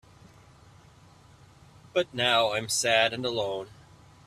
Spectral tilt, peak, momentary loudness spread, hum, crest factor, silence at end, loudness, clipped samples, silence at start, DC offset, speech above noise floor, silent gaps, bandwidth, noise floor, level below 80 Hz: -2 dB/octave; -8 dBFS; 10 LU; none; 22 dB; 0.55 s; -26 LUFS; under 0.1%; 1.95 s; under 0.1%; 28 dB; none; 15 kHz; -55 dBFS; -64 dBFS